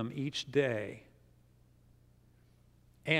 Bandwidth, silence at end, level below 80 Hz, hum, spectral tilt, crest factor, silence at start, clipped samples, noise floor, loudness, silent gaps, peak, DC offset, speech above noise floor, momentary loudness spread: 14 kHz; 0 s; -68 dBFS; 60 Hz at -65 dBFS; -5 dB/octave; 26 dB; 0 s; under 0.1%; -64 dBFS; -35 LUFS; none; -12 dBFS; under 0.1%; 30 dB; 13 LU